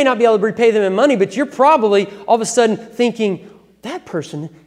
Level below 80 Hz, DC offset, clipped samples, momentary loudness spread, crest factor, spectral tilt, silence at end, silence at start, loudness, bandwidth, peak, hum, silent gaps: -64 dBFS; under 0.1%; under 0.1%; 16 LU; 16 dB; -4.5 dB/octave; 0.2 s; 0 s; -15 LUFS; 12.5 kHz; 0 dBFS; none; none